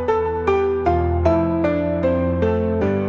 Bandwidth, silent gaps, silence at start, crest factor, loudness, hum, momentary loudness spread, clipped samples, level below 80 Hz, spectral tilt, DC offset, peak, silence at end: 6.8 kHz; none; 0 s; 16 dB; -19 LUFS; none; 2 LU; under 0.1%; -36 dBFS; -9.5 dB/octave; 0.2%; -4 dBFS; 0 s